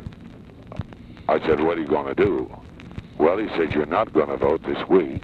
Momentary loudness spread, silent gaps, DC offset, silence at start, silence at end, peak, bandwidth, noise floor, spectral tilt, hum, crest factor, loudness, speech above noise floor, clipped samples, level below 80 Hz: 19 LU; none; under 0.1%; 0 s; 0 s; -4 dBFS; 5.4 kHz; -42 dBFS; -8.5 dB/octave; none; 18 dB; -22 LUFS; 21 dB; under 0.1%; -46 dBFS